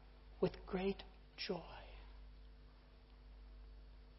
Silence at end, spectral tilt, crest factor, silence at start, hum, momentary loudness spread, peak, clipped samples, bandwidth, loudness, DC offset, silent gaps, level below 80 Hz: 0 s; -5 dB/octave; 24 dB; 0 s; none; 22 LU; -24 dBFS; under 0.1%; 5.8 kHz; -44 LUFS; under 0.1%; none; -58 dBFS